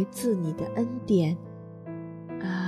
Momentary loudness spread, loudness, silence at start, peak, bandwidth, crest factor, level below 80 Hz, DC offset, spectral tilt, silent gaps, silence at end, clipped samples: 15 LU; -29 LUFS; 0 s; -12 dBFS; 13.5 kHz; 16 dB; -62 dBFS; under 0.1%; -7 dB/octave; none; 0 s; under 0.1%